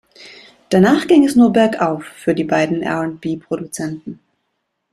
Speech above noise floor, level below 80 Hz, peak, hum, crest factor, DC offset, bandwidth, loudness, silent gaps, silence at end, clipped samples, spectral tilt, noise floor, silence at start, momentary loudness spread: 57 dB; -54 dBFS; -2 dBFS; none; 16 dB; under 0.1%; 13.5 kHz; -16 LUFS; none; 0.8 s; under 0.1%; -6 dB/octave; -72 dBFS; 0.2 s; 14 LU